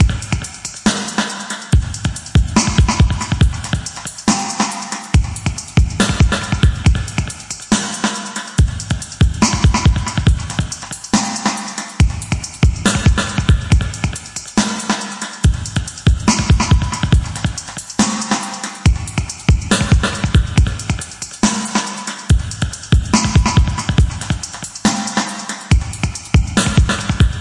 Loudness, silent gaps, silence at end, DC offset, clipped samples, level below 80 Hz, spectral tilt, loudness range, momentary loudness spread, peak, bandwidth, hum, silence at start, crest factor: -17 LUFS; none; 0 s; under 0.1%; under 0.1%; -22 dBFS; -4.5 dB/octave; 1 LU; 9 LU; -2 dBFS; 11.5 kHz; none; 0 s; 14 dB